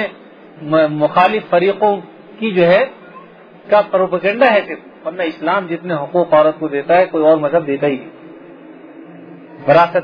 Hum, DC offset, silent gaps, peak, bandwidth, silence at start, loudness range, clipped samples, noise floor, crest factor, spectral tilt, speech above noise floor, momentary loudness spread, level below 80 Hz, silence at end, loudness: none; under 0.1%; none; 0 dBFS; 5.2 kHz; 0 s; 2 LU; under 0.1%; -39 dBFS; 16 dB; -8.5 dB/octave; 26 dB; 12 LU; -62 dBFS; 0 s; -15 LUFS